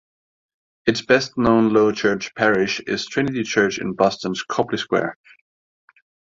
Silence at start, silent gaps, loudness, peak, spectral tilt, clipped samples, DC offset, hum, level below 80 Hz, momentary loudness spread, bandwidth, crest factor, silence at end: 0.85 s; none; -20 LUFS; -2 dBFS; -5 dB/octave; under 0.1%; under 0.1%; none; -52 dBFS; 7 LU; 7.8 kHz; 20 dB; 1.2 s